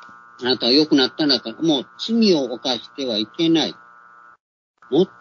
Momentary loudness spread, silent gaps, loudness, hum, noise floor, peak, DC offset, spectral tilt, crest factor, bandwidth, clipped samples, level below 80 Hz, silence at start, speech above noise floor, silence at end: 8 LU; 4.40-4.74 s; -19 LUFS; none; -48 dBFS; -2 dBFS; under 0.1%; -4.5 dB/octave; 18 dB; 7.2 kHz; under 0.1%; -66 dBFS; 0 s; 28 dB; 0.15 s